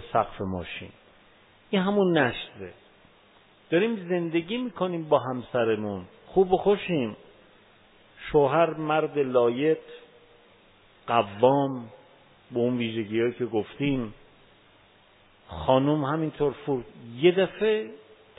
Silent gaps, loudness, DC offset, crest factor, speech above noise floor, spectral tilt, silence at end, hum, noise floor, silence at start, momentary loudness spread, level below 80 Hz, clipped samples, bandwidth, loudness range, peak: none; -26 LUFS; under 0.1%; 22 dB; 33 dB; -10.5 dB/octave; 0.4 s; none; -58 dBFS; 0 s; 16 LU; -56 dBFS; under 0.1%; 4 kHz; 3 LU; -6 dBFS